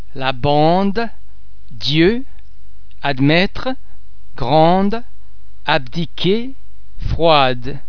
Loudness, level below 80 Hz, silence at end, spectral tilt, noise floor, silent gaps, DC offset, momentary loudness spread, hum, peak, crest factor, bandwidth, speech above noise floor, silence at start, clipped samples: -17 LUFS; -34 dBFS; 0 s; -7 dB/octave; -41 dBFS; none; 10%; 14 LU; none; 0 dBFS; 18 dB; 5.4 kHz; 25 dB; 0 s; under 0.1%